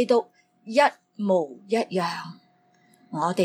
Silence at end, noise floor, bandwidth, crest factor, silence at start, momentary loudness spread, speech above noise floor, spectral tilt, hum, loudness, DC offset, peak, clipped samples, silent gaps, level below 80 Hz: 0 s; -62 dBFS; 16 kHz; 20 dB; 0 s; 15 LU; 38 dB; -5.5 dB/octave; none; -25 LUFS; under 0.1%; -6 dBFS; under 0.1%; none; -80 dBFS